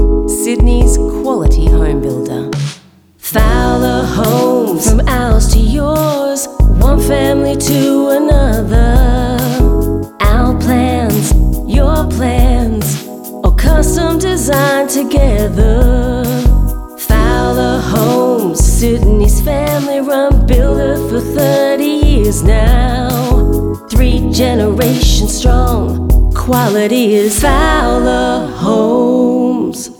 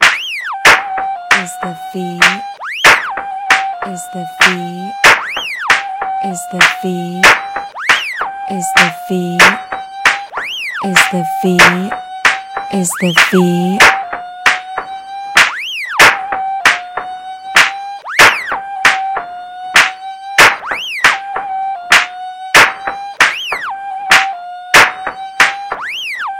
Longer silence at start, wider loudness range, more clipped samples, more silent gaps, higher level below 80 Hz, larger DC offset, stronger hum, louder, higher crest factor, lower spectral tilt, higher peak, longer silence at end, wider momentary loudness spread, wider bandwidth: about the same, 0 s vs 0 s; about the same, 2 LU vs 2 LU; second, under 0.1% vs 1%; neither; first, -14 dBFS vs -46 dBFS; neither; neither; about the same, -12 LUFS vs -11 LUFS; about the same, 10 dB vs 14 dB; first, -5.5 dB/octave vs -2.5 dB/octave; about the same, 0 dBFS vs 0 dBFS; about the same, 0.05 s vs 0 s; second, 4 LU vs 15 LU; about the same, 19 kHz vs over 20 kHz